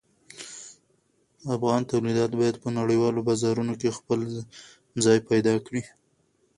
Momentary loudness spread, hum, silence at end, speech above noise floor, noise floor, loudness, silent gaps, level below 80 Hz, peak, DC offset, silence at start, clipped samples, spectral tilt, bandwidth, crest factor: 18 LU; none; 0.7 s; 43 dB; -68 dBFS; -25 LUFS; none; -62 dBFS; -8 dBFS; under 0.1%; 0.35 s; under 0.1%; -5.5 dB/octave; 11.5 kHz; 18 dB